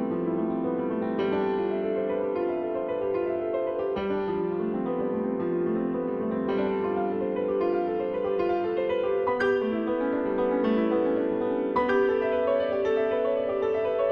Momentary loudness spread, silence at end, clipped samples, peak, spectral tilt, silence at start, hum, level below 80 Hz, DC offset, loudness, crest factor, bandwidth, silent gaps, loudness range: 4 LU; 0 s; under 0.1%; -12 dBFS; -8.5 dB/octave; 0 s; none; -58 dBFS; under 0.1%; -27 LUFS; 14 dB; 6.2 kHz; none; 3 LU